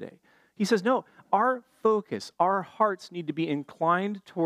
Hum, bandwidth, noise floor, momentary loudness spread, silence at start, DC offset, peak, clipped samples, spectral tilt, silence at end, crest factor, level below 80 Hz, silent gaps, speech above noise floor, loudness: none; 14.5 kHz; -54 dBFS; 8 LU; 0 s; under 0.1%; -10 dBFS; under 0.1%; -6 dB/octave; 0 s; 18 dB; -78 dBFS; none; 27 dB; -27 LUFS